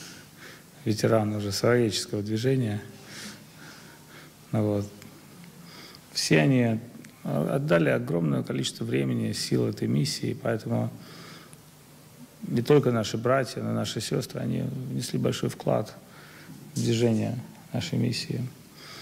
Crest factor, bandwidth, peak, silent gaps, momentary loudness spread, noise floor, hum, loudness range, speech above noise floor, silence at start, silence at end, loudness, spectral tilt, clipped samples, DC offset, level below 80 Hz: 18 dB; 16 kHz; -10 dBFS; none; 23 LU; -51 dBFS; none; 5 LU; 25 dB; 0 s; 0 s; -27 LUFS; -5.5 dB/octave; under 0.1%; under 0.1%; -62 dBFS